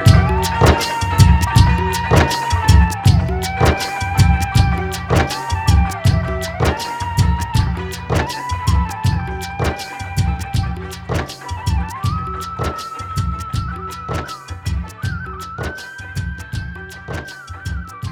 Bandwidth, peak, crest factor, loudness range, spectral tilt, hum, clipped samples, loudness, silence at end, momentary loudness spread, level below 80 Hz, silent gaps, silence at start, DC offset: 19 kHz; 0 dBFS; 16 dB; 12 LU; -5.5 dB/octave; none; under 0.1%; -18 LUFS; 0 s; 14 LU; -24 dBFS; none; 0 s; under 0.1%